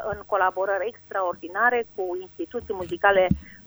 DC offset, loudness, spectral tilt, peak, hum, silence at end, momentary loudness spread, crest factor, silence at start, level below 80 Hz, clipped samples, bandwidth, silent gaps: under 0.1%; -25 LUFS; -6.5 dB/octave; -4 dBFS; 50 Hz at -60 dBFS; 0.1 s; 11 LU; 20 dB; 0 s; -48 dBFS; under 0.1%; over 20 kHz; none